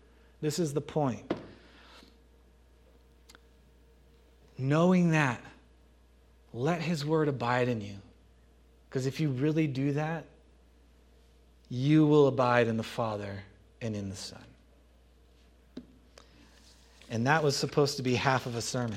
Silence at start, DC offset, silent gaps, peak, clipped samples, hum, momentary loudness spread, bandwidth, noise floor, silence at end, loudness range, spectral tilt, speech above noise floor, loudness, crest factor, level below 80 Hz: 0.4 s; under 0.1%; none; -8 dBFS; under 0.1%; none; 18 LU; 15 kHz; -60 dBFS; 0 s; 13 LU; -6 dB/octave; 32 dB; -29 LUFS; 22 dB; -62 dBFS